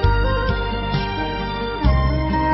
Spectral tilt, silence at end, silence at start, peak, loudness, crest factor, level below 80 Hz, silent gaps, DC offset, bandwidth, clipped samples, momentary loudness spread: -9 dB/octave; 0 s; 0 s; -6 dBFS; -21 LUFS; 14 dB; -22 dBFS; none; under 0.1%; 5.8 kHz; under 0.1%; 5 LU